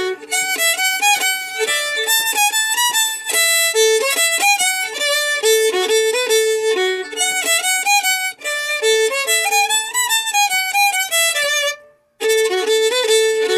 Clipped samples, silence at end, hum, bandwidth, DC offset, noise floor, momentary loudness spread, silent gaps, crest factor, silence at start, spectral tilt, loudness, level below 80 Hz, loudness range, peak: under 0.1%; 0 s; none; 16 kHz; under 0.1%; -38 dBFS; 5 LU; none; 14 dB; 0 s; 2.5 dB/octave; -15 LUFS; -74 dBFS; 2 LU; -2 dBFS